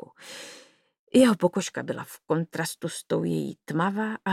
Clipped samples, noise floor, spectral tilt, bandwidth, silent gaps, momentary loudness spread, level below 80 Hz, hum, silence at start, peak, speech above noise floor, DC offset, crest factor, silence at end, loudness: under 0.1%; -55 dBFS; -5.5 dB/octave; 16 kHz; 0.99-1.07 s; 20 LU; -74 dBFS; none; 0.2 s; -6 dBFS; 29 dB; under 0.1%; 20 dB; 0 s; -26 LUFS